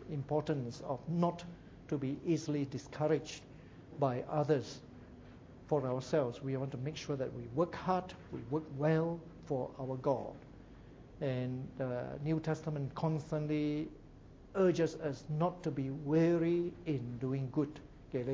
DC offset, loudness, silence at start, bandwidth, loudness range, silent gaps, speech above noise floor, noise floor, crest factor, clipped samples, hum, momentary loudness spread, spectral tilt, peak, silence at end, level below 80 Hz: under 0.1%; -36 LUFS; 0 s; 7.8 kHz; 4 LU; none; 20 dB; -56 dBFS; 18 dB; under 0.1%; none; 19 LU; -7.5 dB/octave; -18 dBFS; 0 s; -62 dBFS